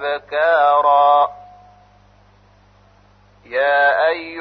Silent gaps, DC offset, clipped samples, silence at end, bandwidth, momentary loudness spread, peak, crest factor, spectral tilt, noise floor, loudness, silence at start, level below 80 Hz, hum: none; under 0.1%; under 0.1%; 0 s; 5.4 kHz; 9 LU; -4 dBFS; 14 dB; -5 dB/octave; -51 dBFS; -15 LUFS; 0 s; -58 dBFS; 50 Hz at -60 dBFS